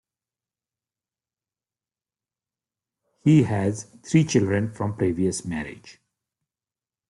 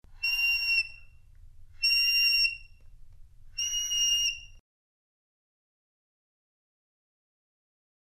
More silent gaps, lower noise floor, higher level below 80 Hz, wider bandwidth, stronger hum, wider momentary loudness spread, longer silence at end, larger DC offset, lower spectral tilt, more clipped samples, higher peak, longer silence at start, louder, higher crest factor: neither; first, under -90 dBFS vs -51 dBFS; second, -60 dBFS vs -54 dBFS; second, 11.5 kHz vs 15.5 kHz; neither; about the same, 13 LU vs 15 LU; second, 1.2 s vs 3.5 s; neither; first, -6.5 dB/octave vs 4 dB/octave; neither; first, -6 dBFS vs -14 dBFS; first, 3.25 s vs 0.1 s; about the same, -23 LUFS vs -25 LUFS; about the same, 20 dB vs 18 dB